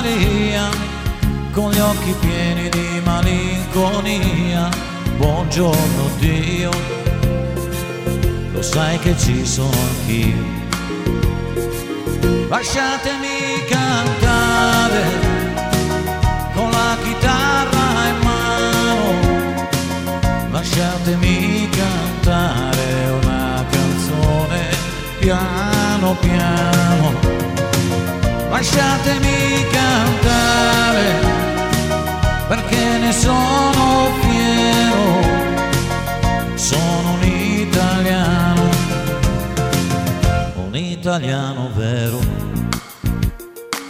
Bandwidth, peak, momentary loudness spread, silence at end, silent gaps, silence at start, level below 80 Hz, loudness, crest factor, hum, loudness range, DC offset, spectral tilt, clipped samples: 16 kHz; 0 dBFS; 7 LU; 0 s; none; 0 s; -26 dBFS; -17 LUFS; 16 dB; none; 4 LU; under 0.1%; -5 dB/octave; under 0.1%